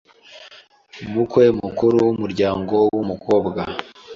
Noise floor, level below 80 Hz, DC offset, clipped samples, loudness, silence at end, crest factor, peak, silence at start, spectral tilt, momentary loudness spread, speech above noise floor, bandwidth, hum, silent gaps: -47 dBFS; -50 dBFS; under 0.1%; under 0.1%; -19 LUFS; 0 s; 16 dB; -2 dBFS; 0.3 s; -7.5 dB/octave; 11 LU; 29 dB; 7.4 kHz; none; none